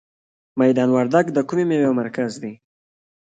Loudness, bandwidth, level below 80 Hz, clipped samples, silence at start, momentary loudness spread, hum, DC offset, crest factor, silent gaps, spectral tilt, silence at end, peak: -19 LUFS; 9 kHz; -68 dBFS; under 0.1%; 0.55 s; 14 LU; none; under 0.1%; 18 dB; none; -7 dB/octave; 0.7 s; -4 dBFS